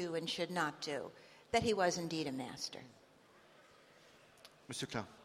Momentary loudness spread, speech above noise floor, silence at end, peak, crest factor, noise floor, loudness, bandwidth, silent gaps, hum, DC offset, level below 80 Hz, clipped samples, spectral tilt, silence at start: 25 LU; 26 dB; 0 s; -18 dBFS; 24 dB; -65 dBFS; -39 LUFS; 16 kHz; none; none; under 0.1%; -70 dBFS; under 0.1%; -4 dB/octave; 0 s